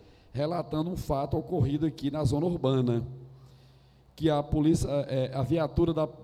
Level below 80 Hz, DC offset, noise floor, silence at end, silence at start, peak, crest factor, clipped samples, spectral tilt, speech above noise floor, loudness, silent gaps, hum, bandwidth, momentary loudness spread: -46 dBFS; under 0.1%; -58 dBFS; 0 s; 0.35 s; -14 dBFS; 16 dB; under 0.1%; -7.5 dB/octave; 30 dB; -29 LUFS; none; none; 14.5 kHz; 6 LU